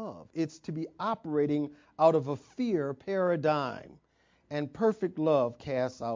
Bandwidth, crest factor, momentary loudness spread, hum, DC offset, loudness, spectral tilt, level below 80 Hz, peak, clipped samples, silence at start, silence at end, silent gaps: 7.6 kHz; 20 dB; 12 LU; none; under 0.1%; -31 LUFS; -7.5 dB/octave; -68 dBFS; -10 dBFS; under 0.1%; 0 s; 0 s; none